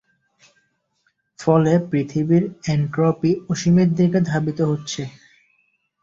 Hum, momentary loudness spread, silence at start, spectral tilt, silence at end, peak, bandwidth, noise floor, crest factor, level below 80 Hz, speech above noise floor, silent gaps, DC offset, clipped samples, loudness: none; 9 LU; 1.4 s; -7 dB/octave; 0.9 s; -4 dBFS; 7.6 kHz; -68 dBFS; 18 dB; -54 dBFS; 50 dB; none; under 0.1%; under 0.1%; -19 LUFS